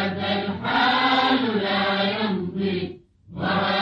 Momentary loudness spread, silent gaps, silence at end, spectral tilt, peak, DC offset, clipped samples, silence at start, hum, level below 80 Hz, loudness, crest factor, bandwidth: 10 LU; none; 0 s; -6.5 dB/octave; -8 dBFS; under 0.1%; under 0.1%; 0 s; none; -58 dBFS; -22 LUFS; 14 dB; 7.2 kHz